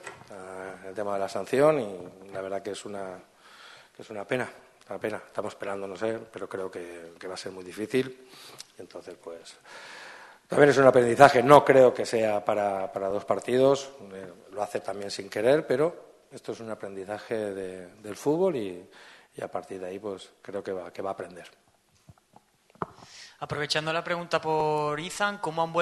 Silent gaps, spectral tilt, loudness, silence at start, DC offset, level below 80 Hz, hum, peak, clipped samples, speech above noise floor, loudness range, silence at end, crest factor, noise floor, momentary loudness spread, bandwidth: none; -5 dB/octave; -26 LUFS; 0.05 s; under 0.1%; -66 dBFS; none; 0 dBFS; under 0.1%; 34 dB; 16 LU; 0 s; 26 dB; -61 dBFS; 24 LU; 12.5 kHz